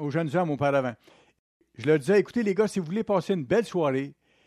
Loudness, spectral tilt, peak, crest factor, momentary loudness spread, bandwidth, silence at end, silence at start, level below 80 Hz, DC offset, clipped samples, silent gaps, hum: -26 LUFS; -7 dB/octave; -10 dBFS; 16 dB; 8 LU; 13 kHz; 0.35 s; 0 s; -66 dBFS; under 0.1%; under 0.1%; 1.39-1.60 s; none